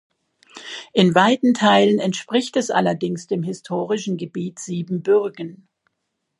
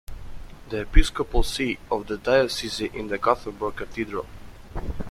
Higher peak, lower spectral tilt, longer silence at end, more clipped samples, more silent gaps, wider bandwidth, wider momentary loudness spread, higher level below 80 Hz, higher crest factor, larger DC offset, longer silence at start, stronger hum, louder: about the same, 0 dBFS vs -2 dBFS; about the same, -5 dB/octave vs -4.5 dB/octave; first, 0.85 s vs 0 s; neither; neither; second, 11.5 kHz vs 13.5 kHz; second, 14 LU vs 20 LU; second, -68 dBFS vs -28 dBFS; about the same, 20 dB vs 22 dB; neither; first, 0.55 s vs 0.1 s; neither; first, -20 LUFS vs -26 LUFS